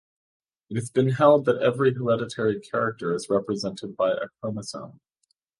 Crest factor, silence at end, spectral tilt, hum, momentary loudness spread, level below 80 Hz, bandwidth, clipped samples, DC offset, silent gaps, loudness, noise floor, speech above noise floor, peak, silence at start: 22 dB; 0.7 s; -6.5 dB/octave; none; 14 LU; -64 dBFS; 11.5 kHz; under 0.1%; under 0.1%; none; -24 LUFS; -74 dBFS; 50 dB; -4 dBFS; 0.7 s